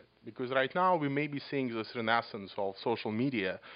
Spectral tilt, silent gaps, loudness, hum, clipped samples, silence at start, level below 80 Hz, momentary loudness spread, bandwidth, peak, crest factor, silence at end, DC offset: -3.5 dB/octave; none; -33 LUFS; none; under 0.1%; 0.25 s; -80 dBFS; 9 LU; 5.2 kHz; -14 dBFS; 20 dB; 0 s; under 0.1%